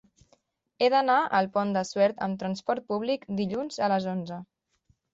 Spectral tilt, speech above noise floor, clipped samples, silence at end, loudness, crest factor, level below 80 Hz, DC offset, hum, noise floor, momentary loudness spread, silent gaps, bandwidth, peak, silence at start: -5.5 dB/octave; 43 dB; under 0.1%; 0.7 s; -27 LUFS; 18 dB; -70 dBFS; under 0.1%; none; -69 dBFS; 9 LU; none; 7.8 kHz; -10 dBFS; 0.8 s